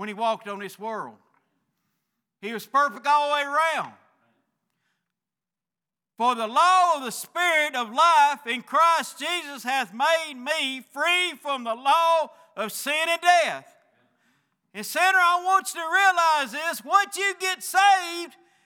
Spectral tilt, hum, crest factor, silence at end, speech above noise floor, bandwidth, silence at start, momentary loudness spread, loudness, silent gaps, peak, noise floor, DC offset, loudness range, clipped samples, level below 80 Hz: -1 dB/octave; none; 20 dB; 0.35 s; over 67 dB; over 20 kHz; 0 s; 15 LU; -22 LUFS; none; -6 dBFS; under -90 dBFS; under 0.1%; 6 LU; under 0.1%; under -90 dBFS